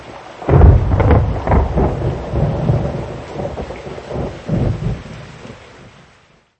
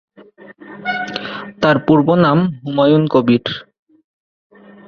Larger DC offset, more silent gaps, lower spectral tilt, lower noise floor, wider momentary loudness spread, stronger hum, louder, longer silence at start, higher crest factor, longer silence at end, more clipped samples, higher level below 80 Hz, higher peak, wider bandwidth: neither; neither; about the same, -9 dB/octave vs -8 dB/octave; first, -50 dBFS vs -42 dBFS; first, 21 LU vs 14 LU; neither; about the same, -17 LUFS vs -15 LUFS; second, 0 s vs 0.5 s; about the same, 16 dB vs 16 dB; second, 0.7 s vs 1.25 s; neither; first, -20 dBFS vs -54 dBFS; about the same, 0 dBFS vs 0 dBFS; first, 8.2 kHz vs 6.8 kHz